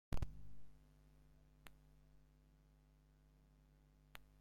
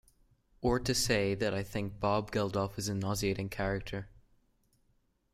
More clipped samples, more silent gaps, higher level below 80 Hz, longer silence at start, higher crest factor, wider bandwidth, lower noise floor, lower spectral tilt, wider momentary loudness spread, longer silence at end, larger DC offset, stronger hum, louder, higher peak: neither; neither; second, -58 dBFS vs -50 dBFS; second, 0.1 s vs 0.6 s; about the same, 20 dB vs 18 dB; about the same, 16 kHz vs 16 kHz; about the same, -71 dBFS vs -73 dBFS; first, -6 dB/octave vs -4.5 dB/octave; first, 17 LU vs 8 LU; second, 0.2 s vs 1.15 s; neither; first, 50 Hz at -70 dBFS vs none; second, -56 LUFS vs -33 LUFS; second, -30 dBFS vs -16 dBFS